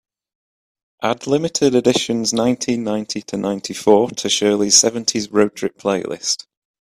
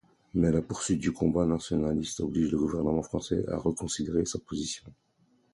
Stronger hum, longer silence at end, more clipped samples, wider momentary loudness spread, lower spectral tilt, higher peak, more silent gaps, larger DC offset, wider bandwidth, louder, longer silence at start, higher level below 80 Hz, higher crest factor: neither; about the same, 0.5 s vs 0.6 s; neither; first, 11 LU vs 7 LU; second, -3 dB/octave vs -5.5 dB/octave; first, 0 dBFS vs -12 dBFS; neither; neither; first, 15 kHz vs 11.5 kHz; first, -17 LUFS vs -30 LUFS; first, 1 s vs 0.35 s; second, -58 dBFS vs -48 dBFS; about the same, 18 dB vs 18 dB